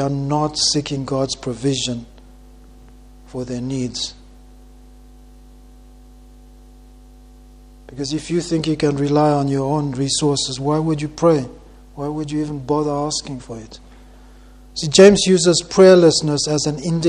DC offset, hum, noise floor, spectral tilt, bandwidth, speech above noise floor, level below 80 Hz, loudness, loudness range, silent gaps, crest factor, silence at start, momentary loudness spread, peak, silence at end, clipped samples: under 0.1%; 50 Hz at -45 dBFS; -43 dBFS; -4.5 dB/octave; 11 kHz; 26 dB; -44 dBFS; -17 LUFS; 16 LU; none; 20 dB; 0 s; 18 LU; 0 dBFS; 0 s; under 0.1%